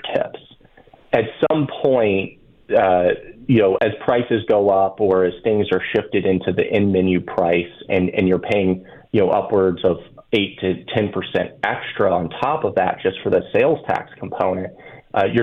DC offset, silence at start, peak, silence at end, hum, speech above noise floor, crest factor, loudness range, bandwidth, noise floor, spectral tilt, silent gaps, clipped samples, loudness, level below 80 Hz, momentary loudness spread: under 0.1%; 0.05 s; -4 dBFS; 0 s; none; 31 dB; 14 dB; 3 LU; 5.6 kHz; -49 dBFS; -8.5 dB/octave; none; under 0.1%; -19 LUFS; -52 dBFS; 7 LU